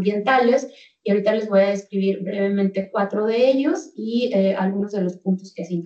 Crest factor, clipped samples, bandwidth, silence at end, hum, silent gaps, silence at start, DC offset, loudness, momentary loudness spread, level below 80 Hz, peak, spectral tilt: 14 dB; under 0.1%; 7.8 kHz; 0 s; none; none; 0 s; under 0.1%; -21 LUFS; 8 LU; -74 dBFS; -6 dBFS; -7 dB/octave